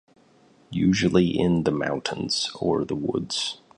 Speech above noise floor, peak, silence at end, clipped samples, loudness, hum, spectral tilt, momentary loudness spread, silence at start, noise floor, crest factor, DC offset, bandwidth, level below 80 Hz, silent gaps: 34 dB; -6 dBFS; 0.25 s; under 0.1%; -24 LUFS; none; -5 dB/octave; 7 LU; 0.7 s; -57 dBFS; 18 dB; under 0.1%; 11 kHz; -50 dBFS; none